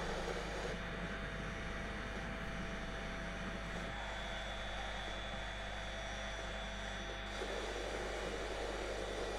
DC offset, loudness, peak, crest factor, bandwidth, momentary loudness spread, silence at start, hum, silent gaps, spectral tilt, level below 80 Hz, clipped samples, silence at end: under 0.1%; -43 LUFS; -28 dBFS; 14 dB; 13.5 kHz; 2 LU; 0 s; none; none; -4 dB/octave; -48 dBFS; under 0.1%; 0 s